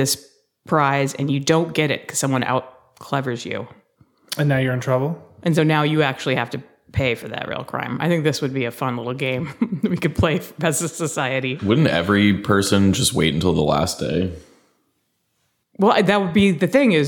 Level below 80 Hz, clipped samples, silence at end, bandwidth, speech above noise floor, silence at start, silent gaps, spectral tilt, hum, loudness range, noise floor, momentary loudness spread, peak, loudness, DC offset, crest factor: -46 dBFS; under 0.1%; 0 s; 19 kHz; 50 dB; 0 s; none; -5 dB/octave; none; 5 LU; -70 dBFS; 10 LU; -2 dBFS; -20 LUFS; under 0.1%; 18 dB